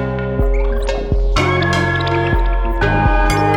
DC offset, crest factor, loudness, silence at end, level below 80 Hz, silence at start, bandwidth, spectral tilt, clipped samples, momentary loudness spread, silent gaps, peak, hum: under 0.1%; 12 dB; -16 LUFS; 0 s; -18 dBFS; 0 s; 11 kHz; -6 dB/octave; under 0.1%; 5 LU; none; -2 dBFS; none